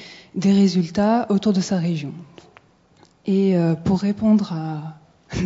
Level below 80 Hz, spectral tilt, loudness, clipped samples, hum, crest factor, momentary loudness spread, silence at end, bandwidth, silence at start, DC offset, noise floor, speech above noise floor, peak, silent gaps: -50 dBFS; -7 dB/octave; -20 LUFS; under 0.1%; none; 14 dB; 15 LU; 0 s; 7.8 kHz; 0 s; under 0.1%; -55 dBFS; 36 dB; -6 dBFS; none